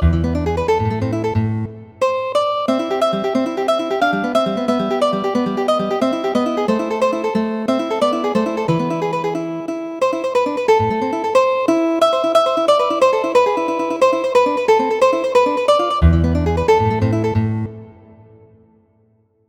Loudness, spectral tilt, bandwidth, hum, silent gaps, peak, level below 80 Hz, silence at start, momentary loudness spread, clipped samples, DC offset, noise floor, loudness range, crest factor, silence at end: -17 LUFS; -6.5 dB/octave; 17 kHz; none; none; 0 dBFS; -32 dBFS; 0 s; 5 LU; under 0.1%; under 0.1%; -58 dBFS; 4 LU; 16 dB; 1.55 s